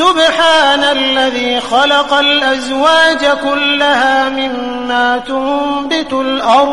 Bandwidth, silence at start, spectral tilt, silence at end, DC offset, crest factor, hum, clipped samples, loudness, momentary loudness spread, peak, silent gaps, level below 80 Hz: 11.5 kHz; 0 s; -2 dB/octave; 0 s; 1%; 12 dB; none; under 0.1%; -11 LUFS; 7 LU; 0 dBFS; none; -46 dBFS